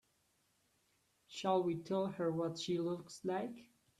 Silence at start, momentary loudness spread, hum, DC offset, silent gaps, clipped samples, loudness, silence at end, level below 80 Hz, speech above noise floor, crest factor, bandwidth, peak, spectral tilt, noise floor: 1.3 s; 10 LU; none; under 0.1%; none; under 0.1%; -39 LUFS; 0.35 s; -80 dBFS; 40 dB; 18 dB; 13 kHz; -22 dBFS; -6 dB/octave; -78 dBFS